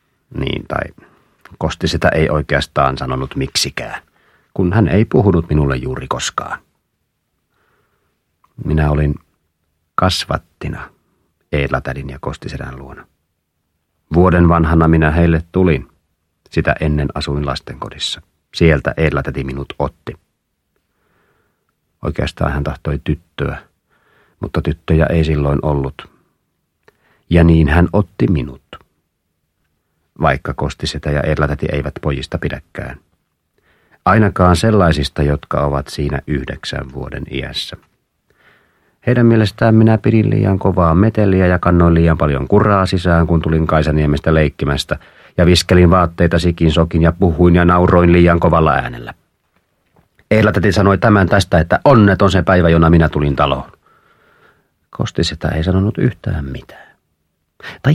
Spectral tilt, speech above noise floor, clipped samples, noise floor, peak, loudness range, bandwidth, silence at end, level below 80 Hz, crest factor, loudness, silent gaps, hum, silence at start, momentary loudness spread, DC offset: -6.5 dB/octave; 56 dB; under 0.1%; -69 dBFS; 0 dBFS; 10 LU; 13 kHz; 0 s; -28 dBFS; 16 dB; -15 LUFS; none; none; 0.3 s; 15 LU; under 0.1%